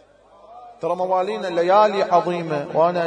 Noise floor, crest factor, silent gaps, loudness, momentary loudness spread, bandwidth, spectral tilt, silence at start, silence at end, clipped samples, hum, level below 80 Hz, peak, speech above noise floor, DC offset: -50 dBFS; 16 dB; none; -20 LUFS; 9 LU; 10 kHz; -6 dB/octave; 0.5 s; 0 s; under 0.1%; none; -68 dBFS; -4 dBFS; 31 dB; under 0.1%